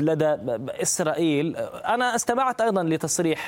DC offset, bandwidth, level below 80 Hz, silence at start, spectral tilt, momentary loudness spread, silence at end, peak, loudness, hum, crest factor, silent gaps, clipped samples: under 0.1%; 17 kHz; -62 dBFS; 0 s; -4 dB/octave; 5 LU; 0 s; -6 dBFS; -24 LUFS; none; 18 dB; none; under 0.1%